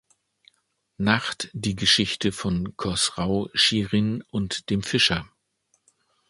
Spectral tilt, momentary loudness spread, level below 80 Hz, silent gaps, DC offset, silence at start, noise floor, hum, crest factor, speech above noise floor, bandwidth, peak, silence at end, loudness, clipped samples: -3.5 dB/octave; 9 LU; -48 dBFS; none; under 0.1%; 1 s; -71 dBFS; none; 24 dB; 47 dB; 11.5 kHz; -2 dBFS; 1.05 s; -23 LUFS; under 0.1%